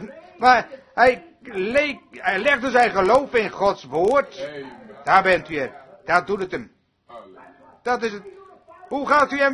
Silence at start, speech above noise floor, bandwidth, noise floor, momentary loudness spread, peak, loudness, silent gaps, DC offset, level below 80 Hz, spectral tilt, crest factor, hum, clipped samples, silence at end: 0 s; 28 dB; 11 kHz; -48 dBFS; 16 LU; 0 dBFS; -20 LUFS; none; under 0.1%; -56 dBFS; -4.5 dB/octave; 20 dB; none; under 0.1%; 0 s